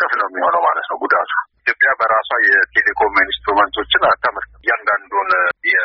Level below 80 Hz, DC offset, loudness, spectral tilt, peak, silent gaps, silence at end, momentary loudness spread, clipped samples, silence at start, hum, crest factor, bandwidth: -50 dBFS; under 0.1%; -15 LUFS; 1.5 dB/octave; -2 dBFS; none; 0 s; 6 LU; under 0.1%; 0 s; none; 14 dB; 5.8 kHz